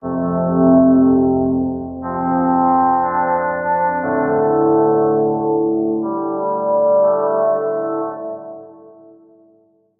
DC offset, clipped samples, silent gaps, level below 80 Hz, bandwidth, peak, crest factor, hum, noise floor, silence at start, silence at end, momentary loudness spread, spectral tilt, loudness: under 0.1%; under 0.1%; none; -54 dBFS; 2.2 kHz; -2 dBFS; 14 dB; none; -55 dBFS; 0.05 s; 1.1 s; 10 LU; -12.5 dB/octave; -16 LUFS